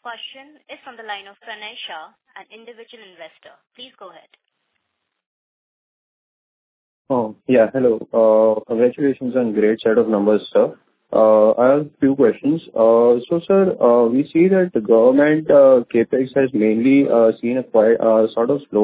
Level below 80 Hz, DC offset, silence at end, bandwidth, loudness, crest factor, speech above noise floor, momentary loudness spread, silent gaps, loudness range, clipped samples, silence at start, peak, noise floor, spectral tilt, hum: -62 dBFS; under 0.1%; 0 s; 4 kHz; -16 LUFS; 16 dB; 59 dB; 18 LU; 5.26-7.05 s; 20 LU; under 0.1%; 0.05 s; -2 dBFS; -75 dBFS; -11 dB/octave; none